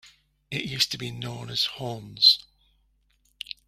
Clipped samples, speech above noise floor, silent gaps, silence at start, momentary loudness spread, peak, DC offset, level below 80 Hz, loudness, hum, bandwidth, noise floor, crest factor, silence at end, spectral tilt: under 0.1%; 41 dB; none; 0.05 s; 18 LU; -6 dBFS; under 0.1%; -62 dBFS; -23 LUFS; none; 16 kHz; -67 dBFS; 24 dB; 0.15 s; -2.5 dB/octave